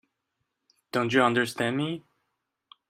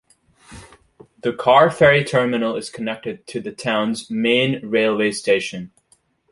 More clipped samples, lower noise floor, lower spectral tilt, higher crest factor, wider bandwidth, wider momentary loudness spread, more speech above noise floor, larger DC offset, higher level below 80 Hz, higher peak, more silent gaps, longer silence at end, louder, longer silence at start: neither; first, -81 dBFS vs -60 dBFS; about the same, -5 dB/octave vs -5 dB/octave; about the same, 22 dB vs 20 dB; first, 15.5 kHz vs 11.5 kHz; second, 10 LU vs 15 LU; first, 55 dB vs 42 dB; neither; second, -70 dBFS vs -54 dBFS; second, -8 dBFS vs 0 dBFS; neither; first, 0.9 s vs 0.65 s; second, -26 LUFS vs -19 LUFS; first, 0.95 s vs 0.5 s